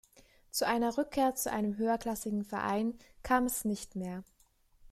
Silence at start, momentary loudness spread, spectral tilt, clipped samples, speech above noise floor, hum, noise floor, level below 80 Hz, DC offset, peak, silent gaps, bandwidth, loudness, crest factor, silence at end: 0.55 s; 10 LU; -4 dB/octave; under 0.1%; 35 dB; none; -68 dBFS; -58 dBFS; under 0.1%; -16 dBFS; none; 15 kHz; -33 LUFS; 18 dB; 0.7 s